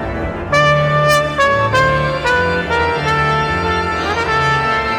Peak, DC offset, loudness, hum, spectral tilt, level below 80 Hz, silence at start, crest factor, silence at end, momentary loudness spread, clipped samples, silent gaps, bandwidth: 0 dBFS; under 0.1%; -14 LUFS; none; -5 dB/octave; -32 dBFS; 0 s; 14 dB; 0 s; 4 LU; under 0.1%; none; 17.5 kHz